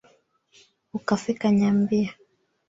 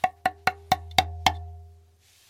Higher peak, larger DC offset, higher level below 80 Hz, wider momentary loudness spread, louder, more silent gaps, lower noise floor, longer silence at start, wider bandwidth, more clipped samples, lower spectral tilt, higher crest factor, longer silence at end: second, -8 dBFS vs 0 dBFS; neither; second, -62 dBFS vs -46 dBFS; about the same, 12 LU vs 12 LU; about the same, -24 LUFS vs -26 LUFS; neither; about the same, -61 dBFS vs -58 dBFS; first, 0.95 s vs 0.05 s; second, 7.8 kHz vs 16.5 kHz; neither; first, -7 dB/octave vs -3 dB/octave; second, 18 dB vs 28 dB; about the same, 0.55 s vs 0.6 s